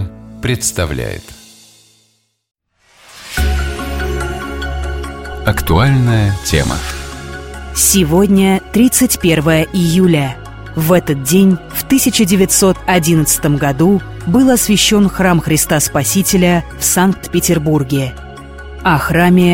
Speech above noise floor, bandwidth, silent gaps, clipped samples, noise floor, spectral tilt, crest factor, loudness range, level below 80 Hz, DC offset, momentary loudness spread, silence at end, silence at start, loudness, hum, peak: 47 dB; 17 kHz; none; under 0.1%; -59 dBFS; -4.5 dB/octave; 14 dB; 11 LU; -28 dBFS; under 0.1%; 14 LU; 0 s; 0 s; -12 LUFS; none; 0 dBFS